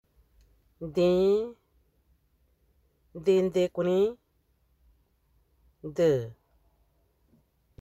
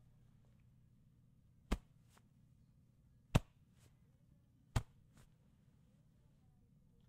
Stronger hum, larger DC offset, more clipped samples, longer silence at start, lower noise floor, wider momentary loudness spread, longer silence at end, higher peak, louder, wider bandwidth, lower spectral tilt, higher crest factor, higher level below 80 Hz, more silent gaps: neither; neither; neither; second, 0.8 s vs 1.7 s; about the same, -70 dBFS vs -70 dBFS; first, 19 LU vs 7 LU; second, 1.5 s vs 2.25 s; about the same, -14 dBFS vs -16 dBFS; first, -27 LUFS vs -43 LUFS; second, 13 kHz vs 15.5 kHz; about the same, -7 dB/octave vs -6 dB/octave; second, 18 dB vs 32 dB; second, -62 dBFS vs -54 dBFS; neither